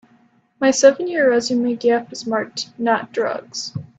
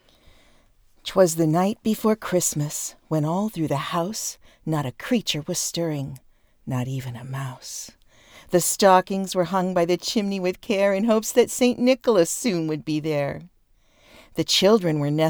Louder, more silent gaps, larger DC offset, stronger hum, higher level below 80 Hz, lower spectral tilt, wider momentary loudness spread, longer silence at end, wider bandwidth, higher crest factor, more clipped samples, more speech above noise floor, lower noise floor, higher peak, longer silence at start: first, -19 LUFS vs -23 LUFS; neither; neither; neither; second, -64 dBFS vs -58 dBFS; about the same, -3.5 dB/octave vs -4.5 dB/octave; about the same, 12 LU vs 13 LU; first, 0.15 s vs 0 s; second, 8.4 kHz vs over 20 kHz; about the same, 18 dB vs 20 dB; neither; about the same, 38 dB vs 37 dB; second, -56 dBFS vs -60 dBFS; about the same, 0 dBFS vs -2 dBFS; second, 0.6 s vs 1.05 s